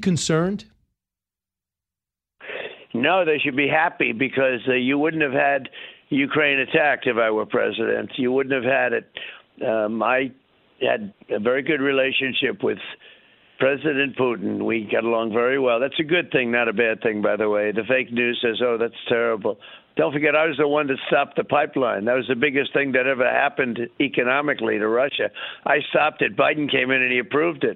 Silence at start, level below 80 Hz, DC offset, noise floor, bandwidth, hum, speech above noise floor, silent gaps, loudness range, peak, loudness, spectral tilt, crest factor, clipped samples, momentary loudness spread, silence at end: 0 s; -64 dBFS; under 0.1%; -90 dBFS; 8.8 kHz; none; 69 dB; none; 3 LU; -4 dBFS; -21 LUFS; -5 dB/octave; 18 dB; under 0.1%; 7 LU; 0 s